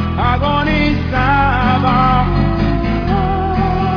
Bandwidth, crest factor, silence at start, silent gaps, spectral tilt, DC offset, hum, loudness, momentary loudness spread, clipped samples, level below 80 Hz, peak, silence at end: 5.4 kHz; 12 dB; 0 s; none; -8.5 dB/octave; under 0.1%; none; -14 LUFS; 4 LU; under 0.1%; -22 dBFS; -2 dBFS; 0 s